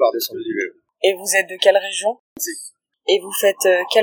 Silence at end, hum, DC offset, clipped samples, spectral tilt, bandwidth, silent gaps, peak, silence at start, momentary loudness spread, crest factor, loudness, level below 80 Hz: 0 s; none; under 0.1%; under 0.1%; -1 dB/octave; 19 kHz; 2.19-2.36 s; 0 dBFS; 0 s; 12 LU; 18 dB; -19 LUFS; -76 dBFS